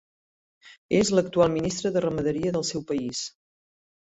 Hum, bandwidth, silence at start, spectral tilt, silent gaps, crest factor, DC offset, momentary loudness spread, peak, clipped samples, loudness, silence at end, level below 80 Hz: none; 8.4 kHz; 0.65 s; -5 dB/octave; 0.78-0.89 s; 20 dB; under 0.1%; 9 LU; -8 dBFS; under 0.1%; -25 LUFS; 0.75 s; -56 dBFS